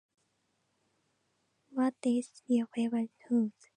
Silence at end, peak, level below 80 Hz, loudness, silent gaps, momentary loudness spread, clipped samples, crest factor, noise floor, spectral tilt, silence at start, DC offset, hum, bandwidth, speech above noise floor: 0.25 s; -18 dBFS; -88 dBFS; -33 LUFS; none; 4 LU; under 0.1%; 16 dB; -78 dBFS; -6 dB/octave; 1.75 s; under 0.1%; none; 10 kHz; 45 dB